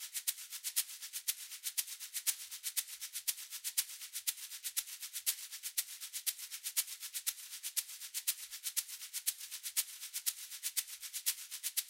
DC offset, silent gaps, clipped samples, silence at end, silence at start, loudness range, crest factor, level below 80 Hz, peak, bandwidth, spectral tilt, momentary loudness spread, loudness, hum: under 0.1%; none; under 0.1%; 0 s; 0 s; 0 LU; 26 dB; under -90 dBFS; -14 dBFS; 17 kHz; 7 dB/octave; 5 LU; -38 LUFS; none